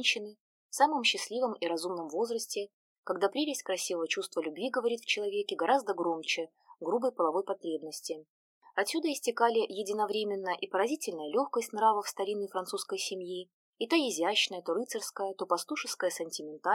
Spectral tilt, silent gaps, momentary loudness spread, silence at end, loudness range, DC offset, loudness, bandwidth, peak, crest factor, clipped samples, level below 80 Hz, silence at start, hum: -2 dB/octave; 0.40-0.69 s, 2.73-3.03 s, 8.30-8.61 s, 13.53-13.73 s; 10 LU; 0 s; 2 LU; under 0.1%; -32 LUFS; 17.5 kHz; -12 dBFS; 20 dB; under 0.1%; under -90 dBFS; 0 s; none